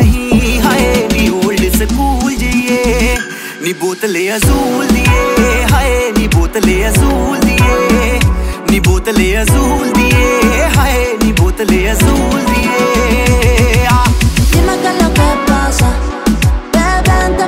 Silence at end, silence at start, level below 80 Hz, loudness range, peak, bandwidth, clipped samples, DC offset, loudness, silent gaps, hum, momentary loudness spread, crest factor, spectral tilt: 0 s; 0 s; -16 dBFS; 2 LU; 0 dBFS; 16.5 kHz; under 0.1%; under 0.1%; -11 LUFS; none; none; 4 LU; 10 dB; -5 dB/octave